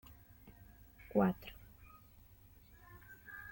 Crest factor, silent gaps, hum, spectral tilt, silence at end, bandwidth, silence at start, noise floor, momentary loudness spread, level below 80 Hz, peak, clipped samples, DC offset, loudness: 24 dB; none; none; -8.5 dB/octave; 0 s; 17 kHz; 0.1 s; -62 dBFS; 28 LU; -64 dBFS; -18 dBFS; under 0.1%; under 0.1%; -38 LUFS